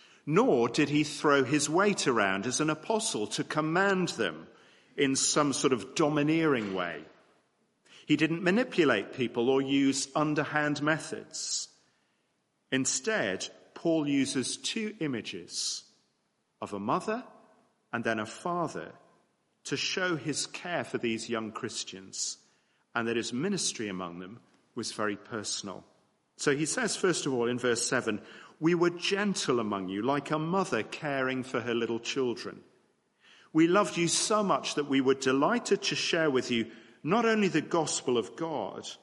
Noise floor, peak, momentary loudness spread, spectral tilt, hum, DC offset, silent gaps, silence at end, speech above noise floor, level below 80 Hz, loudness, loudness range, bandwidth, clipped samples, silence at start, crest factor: -76 dBFS; -10 dBFS; 11 LU; -3.5 dB/octave; none; under 0.1%; none; 0.05 s; 47 dB; -74 dBFS; -29 LUFS; 7 LU; 11.5 kHz; under 0.1%; 0.25 s; 20 dB